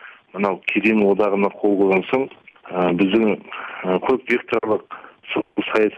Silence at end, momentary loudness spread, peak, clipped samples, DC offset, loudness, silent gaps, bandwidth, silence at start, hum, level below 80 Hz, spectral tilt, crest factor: 0 s; 12 LU; -4 dBFS; under 0.1%; under 0.1%; -20 LUFS; none; 7.4 kHz; 0 s; none; -60 dBFS; -7.5 dB/octave; 16 dB